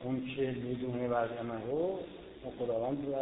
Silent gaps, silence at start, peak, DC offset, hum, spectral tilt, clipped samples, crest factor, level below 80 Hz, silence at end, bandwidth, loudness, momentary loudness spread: none; 0 s; -20 dBFS; under 0.1%; none; -5 dB/octave; under 0.1%; 16 dB; -62 dBFS; 0 s; 3.9 kHz; -36 LUFS; 9 LU